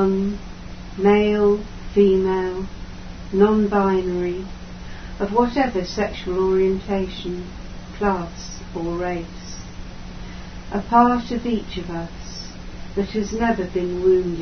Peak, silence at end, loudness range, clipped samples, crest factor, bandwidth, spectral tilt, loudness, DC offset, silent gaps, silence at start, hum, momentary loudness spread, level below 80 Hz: -2 dBFS; 0 s; 7 LU; under 0.1%; 18 dB; 6.6 kHz; -6.5 dB/octave; -21 LUFS; under 0.1%; none; 0 s; none; 20 LU; -38 dBFS